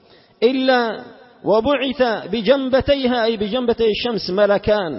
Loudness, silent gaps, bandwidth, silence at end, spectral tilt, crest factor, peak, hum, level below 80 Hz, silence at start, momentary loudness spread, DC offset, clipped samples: -18 LUFS; none; 5.8 kHz; 0 s; -8.5 dB/octave; 16 dB; -2 dBFS; none; -44 dBFS; 0.4 s; 5 LU; under 0.1%; under 0.1%